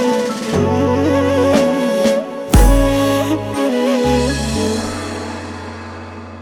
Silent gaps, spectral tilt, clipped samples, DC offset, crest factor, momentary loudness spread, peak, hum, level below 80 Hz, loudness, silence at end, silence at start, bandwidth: none; -5.5 dB/octave; under 0.1%; under 0.1%; 16 dB; 15 LU; 0 dBFS; none; -22 dBFS; -16 LUFS; 0 s; 0 s; 18 kHz